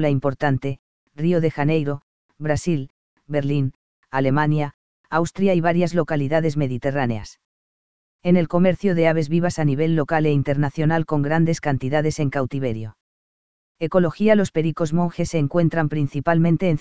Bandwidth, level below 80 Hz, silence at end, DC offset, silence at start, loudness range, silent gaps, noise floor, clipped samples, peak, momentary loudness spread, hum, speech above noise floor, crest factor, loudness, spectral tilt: 8 kHz; -48 dBFS; 0 s; 2%; 0 s; 4 LU; 0.79-1.07 s, 2.03-2.29 s, 2.90-3.17 s, 3.75-4.03 s, 4.74-5.04 s, 7.45-8.19 s, 13.01-13.75 s; under -90 dBFS; under 0.1%; -2 dBFS; 9 LU; none; over 70 dB; 18 dB; -21 LUFS; -7.5 dB/octave